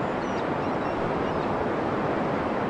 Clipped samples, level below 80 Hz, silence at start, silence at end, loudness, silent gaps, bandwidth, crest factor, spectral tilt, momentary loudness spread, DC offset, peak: under 0.1%; -50 dBFS; 0 s; 0 s; -27 LUFS; none; 11 kHz; 12 dB; -7 dB/octave; 1 LU; under 0.1%; -14 dBFS